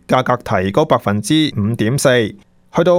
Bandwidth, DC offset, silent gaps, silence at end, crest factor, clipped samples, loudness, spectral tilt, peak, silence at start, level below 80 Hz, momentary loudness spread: 16.5 kHz; under 0.1%; none; 0 s; 16 dB; under 0.1%; -16 LUFS; -5.5 dB/octave; 0 dBFS; 0.1 s; -48 dBFS; 4 LU